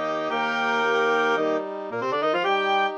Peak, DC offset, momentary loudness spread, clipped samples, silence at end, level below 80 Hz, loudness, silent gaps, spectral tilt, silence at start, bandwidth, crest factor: -12 dBFS; under 0.1%; 6 LU; under 0.1%; 0 s; -74 dBFS; -23 LUFS; none; -4 dB/octave; 0 s; 8.4 kHz; 12 dB